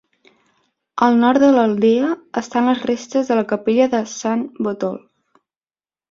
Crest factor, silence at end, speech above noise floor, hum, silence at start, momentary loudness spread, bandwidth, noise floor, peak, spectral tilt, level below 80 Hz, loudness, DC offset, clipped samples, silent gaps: 16 dB; 1.15 s; over 73 dB; none; 0.95 s; 11 LU; 7.6 kHz; under -90 dBFS; -2 dBFS; -5.5 dB/octave; -62 dBFS; -17 LUFS; under 0.1%; under 0.1%; none